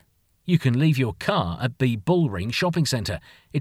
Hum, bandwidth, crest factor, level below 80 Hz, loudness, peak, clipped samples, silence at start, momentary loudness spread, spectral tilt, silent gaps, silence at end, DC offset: none; 15 kHz; 16 dB; -48 dBFS; -23 LUFS; -6 dBFS; under 0.1%; 0.45 s; 10 LU; -6 dB/octave; none; 0 s; under 0.1%